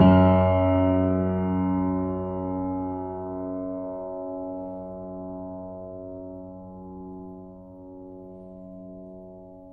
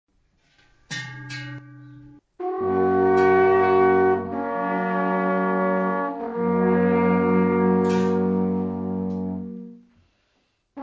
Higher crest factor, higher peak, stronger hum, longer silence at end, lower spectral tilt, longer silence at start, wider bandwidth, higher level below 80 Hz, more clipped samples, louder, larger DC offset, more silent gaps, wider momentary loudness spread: about the same, 20 dB vs 16 dB; about the same, -6 dBFS vs -6 dBFS; neither; about the same, 0 s vs 0 s; first, -11.5 dB/octave vs -8 dB/octave; second, 0 s vs 0.9 s; second, 4.4 kHz vs 8 kHz; about the same, -50 dBFS vs -52 dBFS; neither; second, -26 LUFS vs -21 LUFS; neither; neither; first, 22 LU vs 16 LU